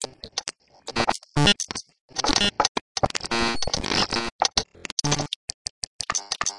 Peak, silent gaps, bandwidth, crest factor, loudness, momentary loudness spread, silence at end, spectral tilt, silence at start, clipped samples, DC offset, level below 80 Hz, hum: -2 dBFS; 2.00-2.09 s, 2.69-2.75 s, 2.81-2.95 s, 4.32-4.39 s, 4.92-4.97 s, 5.36-5.48 s, 5.54-5.99 s; 11.5 kHz; 24 dB; -24 LUFS; 12 LU; 0 s; -2.5 dB/octave; 0 s; under 0.1%; under 0.1%; -44 dBFS; none